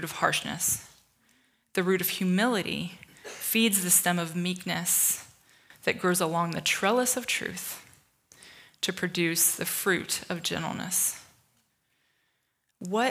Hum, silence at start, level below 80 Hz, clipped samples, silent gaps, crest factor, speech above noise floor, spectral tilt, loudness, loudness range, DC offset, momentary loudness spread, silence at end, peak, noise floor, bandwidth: none; 0 s; -70 dBFS; under 0.1%; none; 22 dB; 48 dB; -2.5 dB/octave; -27 LUFS; 4 LU; under 0.1%; 11 LU; 0 s; -8 dBFS; -76 dBFS; 16.5 kHz